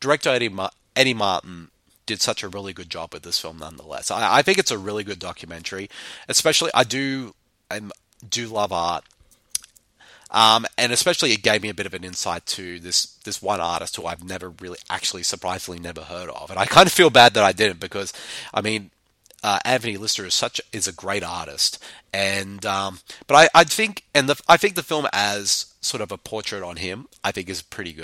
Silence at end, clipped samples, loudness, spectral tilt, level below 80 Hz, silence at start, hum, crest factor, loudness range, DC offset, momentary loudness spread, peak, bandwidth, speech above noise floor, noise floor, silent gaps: 0 s; under 0.1%; -20 LUFS; -2 dB/octave; -56 dBFS; 0 s; none; 22 dB; 8 LU; under 0.1%; 18 LU; 0 dBFS; 16.5 kHz; 31 dB; -53 dBFS; none